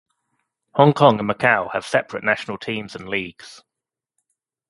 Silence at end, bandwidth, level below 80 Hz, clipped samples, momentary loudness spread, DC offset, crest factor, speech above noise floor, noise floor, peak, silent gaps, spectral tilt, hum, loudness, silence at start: 1.15 s; 11.5 kHz; -60 dBFS; under 0.1%; 13 LU; under 0.1%; 22 dB; 67 dB; -87 dBFS; 0 dBFS; none; -6 dB/octave; none; -19 LUFS; 0.75 s